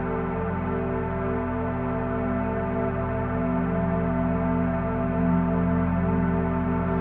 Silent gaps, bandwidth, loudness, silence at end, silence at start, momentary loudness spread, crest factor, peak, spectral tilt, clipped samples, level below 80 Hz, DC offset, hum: none; 3.7 kHz; -26 LUFS; 0 s; 0 s; 4 LU; 12 dB; -12 dBFS; -12 dB/octave; under 0.1%; -38 dBFS; under 0.1%; none